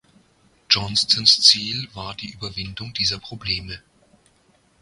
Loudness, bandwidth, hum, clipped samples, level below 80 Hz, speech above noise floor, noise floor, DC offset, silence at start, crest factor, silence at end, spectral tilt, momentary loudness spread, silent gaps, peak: -18 LUFS; 14 kHz; none; under 0.1%; -50 dBFS; 38 dB; -60 dBFS; under 0.1%; 0.7 s; 24 dB; 1.05 s; -1.5 dB/octave; 19 LU; none; 0 dBFS